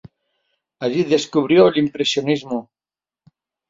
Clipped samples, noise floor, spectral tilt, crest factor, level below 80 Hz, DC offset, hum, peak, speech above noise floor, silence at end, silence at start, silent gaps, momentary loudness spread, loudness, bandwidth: under 0.1%; under -90 dBFS; -5 dB/octave; 18 dB; -62 dBFS; under 0.1%; none; -2 dBFS; over 73 dB; 1.05 s; 0.8 s; none; 13 LU; -18 LUFS; 7.8 kHz